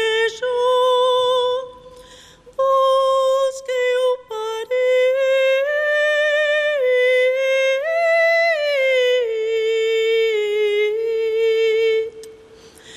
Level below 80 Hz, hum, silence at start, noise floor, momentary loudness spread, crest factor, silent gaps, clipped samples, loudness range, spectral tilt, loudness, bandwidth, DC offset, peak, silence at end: -62 dBFS; none; 0 s; -45 dBFS; 6 LU; 10 dB; none; under 0.1%; 3 LU; -0.5 dB/octave; -18 LUFS; 13.5 kHz; under 0.1%; -8 dBFS; 0 s